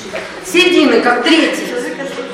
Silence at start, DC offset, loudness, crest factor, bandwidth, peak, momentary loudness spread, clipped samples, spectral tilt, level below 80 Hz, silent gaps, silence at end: 0 s; under 0.1%; -12 LUFS; 14 dB; 16 kHz; 0 dBFS; 14 LU; under 0.1%; -3 dB/octave; -52 dBFS; none; 0 s